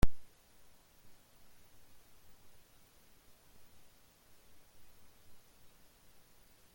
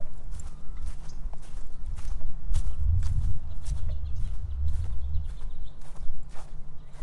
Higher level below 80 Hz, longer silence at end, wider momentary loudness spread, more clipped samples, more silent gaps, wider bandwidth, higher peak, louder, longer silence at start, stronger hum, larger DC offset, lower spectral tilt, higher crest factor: second, -48 dBFS vs -32 dBFS; first, 6.5 s vs 0 s; second, 1 LU vs 16 LU; neither; neither; first, 17 kHz vs 8.8 kHz; second, -14 dBFS vs -10 dBFS; second, -57 LUFS vs -36 LUFS; about the same, 0.05 s vs 0 s; neither; neither; about the same, -6 dB/octave vs -6.5 dB/octave; first, 24 dB vs 12 dB